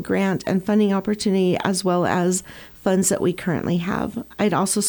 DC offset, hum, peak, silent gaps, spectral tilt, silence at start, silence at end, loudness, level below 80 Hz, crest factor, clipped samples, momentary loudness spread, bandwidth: under 0.1%; none; -4 dBFS; none; -5 dB/octave; 0 s; 0 s; -21 LUFS; -52 dBFS; 16 dB; under 0.1%; 7 LU; 19.5 kHz